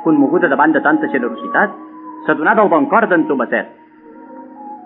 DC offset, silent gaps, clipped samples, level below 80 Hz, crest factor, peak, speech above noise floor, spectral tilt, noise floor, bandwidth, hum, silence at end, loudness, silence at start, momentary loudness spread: under 0.1%; none; under 0.1%; -76 dBFS; 16 dB; 0 dBFS; 25 dB; -5 dB/octave; -39 dBFS; 3.9 kHz; none; 0 s; -14 LUFS; 0 s; 20 LU